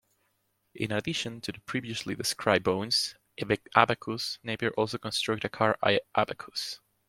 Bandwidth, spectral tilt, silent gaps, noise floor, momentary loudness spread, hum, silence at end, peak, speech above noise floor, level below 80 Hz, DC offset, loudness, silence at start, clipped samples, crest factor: 16.5 kHz; -4 dB/octave; none; -75 dBFS; 10 LU; none; 0.3 s; -2 dBFS; 45 dB; -66 dBFS; under 0.1%; -29 LUFS; 0.75 s; under 0.1%; 28 dB